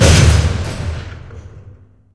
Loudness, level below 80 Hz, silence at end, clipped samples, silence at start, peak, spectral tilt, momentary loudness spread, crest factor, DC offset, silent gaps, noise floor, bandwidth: -14 LUFS; -20 dBFS; 0.45 s; under 0.1%; 0 s; 0 dBFS; -4.5 dB/octave; 25 LU; 14 dB; under 0.1%; none; -42 dBFS; 11 kHz